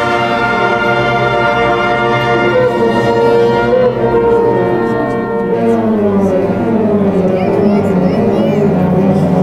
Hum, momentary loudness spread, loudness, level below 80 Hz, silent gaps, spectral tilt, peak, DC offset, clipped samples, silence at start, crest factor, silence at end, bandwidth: none; 3 LU; -12 LUFS; -38 dBFS; none; -7.5 dB/octave; 0 dBFS; under 0.1%; under 0.1%; 0 s; 10 dB; 0 s; 12.5 kHz